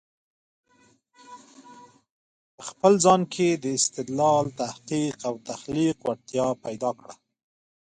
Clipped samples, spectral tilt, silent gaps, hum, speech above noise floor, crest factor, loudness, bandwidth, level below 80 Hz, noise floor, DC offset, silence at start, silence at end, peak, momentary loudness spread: under 0.1%; -4.5 dB/octave; 2.10-2.58 s; none; 38 dB; 22 dB; -24 LUFS; 10 kHz; -64 dBFS; -62 dBFS; under 0.1%; 1.3 s; 0.8 s; -4 dBFS; 13 LU